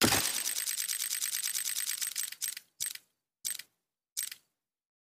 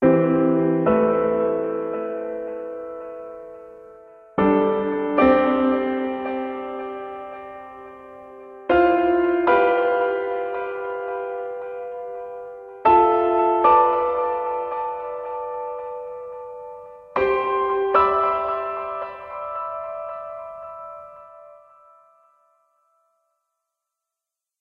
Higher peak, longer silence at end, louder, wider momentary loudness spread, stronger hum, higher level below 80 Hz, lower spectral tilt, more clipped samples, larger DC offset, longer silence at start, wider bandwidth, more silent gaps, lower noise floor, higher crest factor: second, -12 dBFS vs -4 dBFS; second, 0.85 s vs 3.05 s; second, -33 LUFS vs -21 LUFS; second, 10 LU vs 20 LU; neither; second, -64 dBFS vs -54 dBFS; second, -1 dB/octave vs -9.5 dB/octave; neither; neither; about the same, 0 s vs 0 s; first, 16 kHz vs 5 kHz; first, 4.12-4.16 s vs none; second, -77 dBFS vs -86 dBFS; first, 24 dB vs 18 dB